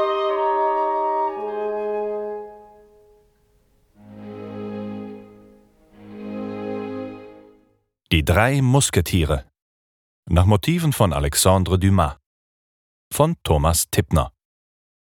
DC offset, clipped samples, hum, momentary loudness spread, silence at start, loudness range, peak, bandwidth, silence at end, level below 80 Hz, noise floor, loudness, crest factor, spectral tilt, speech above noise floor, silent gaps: under 0.1%; under 0.1%; none; 18 LU; 0 s; 16 LU; 0 dBFS; 19 kHz; 0.85 s; -36 dBFS; -64 dBFS; -20 LUFS; 22 dB; -5 dB/octave; 46 dB; 9.62-10.23 s, 12.26-13.11 s